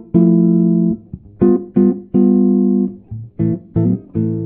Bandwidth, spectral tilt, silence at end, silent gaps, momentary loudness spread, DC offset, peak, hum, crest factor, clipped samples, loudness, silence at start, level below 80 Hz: 2.4 kHz; -14 dB/octave; 0 s; none; 9 LU; under 0.1%; -2 dBFS; none; 14 dB; under 0.1%; -15 LUFS; 0 s; -44 dBFS